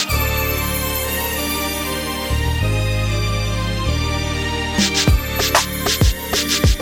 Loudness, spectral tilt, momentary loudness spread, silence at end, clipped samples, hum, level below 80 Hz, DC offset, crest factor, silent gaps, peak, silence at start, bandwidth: -19 LUFS; -3.5 dB/octave; 5 LU; 0 s; under 0.1%; none; -24 dBFS; under 0.1%; 18 dB; none; 0 dBFS; 0 s; 19 kHz